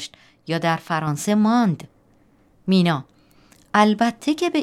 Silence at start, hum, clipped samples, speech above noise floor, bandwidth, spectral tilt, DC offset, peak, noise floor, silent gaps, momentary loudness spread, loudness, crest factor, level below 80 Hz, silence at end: 0 s; none; under 0.1%; 37 dB; 14.5 kHz; -5.5 dB/octave; under 0.1%; -2 dBFS; -57 dBFS; none; 13 LU; -20 LUFS; 18 dB; -64 dBFS; 0 s